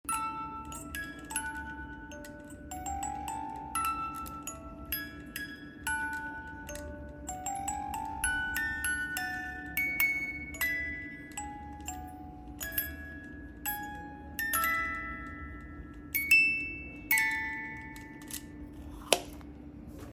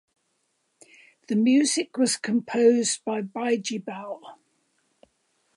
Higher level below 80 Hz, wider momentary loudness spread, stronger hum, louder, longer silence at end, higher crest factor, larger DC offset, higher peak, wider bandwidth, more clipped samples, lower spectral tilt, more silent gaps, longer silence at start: first, -50 dBFS vs -80 dBFS; first, 18 LU vs 15 LU; neither; second, -33 LUFS vs -24 LUFS; second, 0 s vs 1.25 s; first, 32 dB vs 18 dB; neither; first, -4 dBFS vs -8 dBFS; first, 16.5 kHz vs 11.5 kHz; neither; about the same, -2.5 dB/octave vs -3.5 dB/octave; neither; second, 0.05 s vs 1.3 s